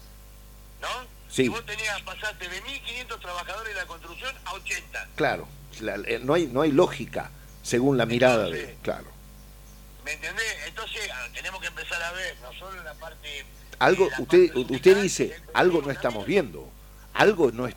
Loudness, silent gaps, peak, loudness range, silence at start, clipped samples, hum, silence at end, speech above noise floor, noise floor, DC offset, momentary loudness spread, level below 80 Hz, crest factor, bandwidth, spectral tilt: -26 LUFS; none; -4 dBFS; 10 LU; 0 s; under 0.1%; 50 Hz at -50 dBFS; 0 s; 21 dB; -47 dBFS; under 0.1%; 17 LU; -48 dBFS; 22 dB; 19 kHz; -4.5 dB/octave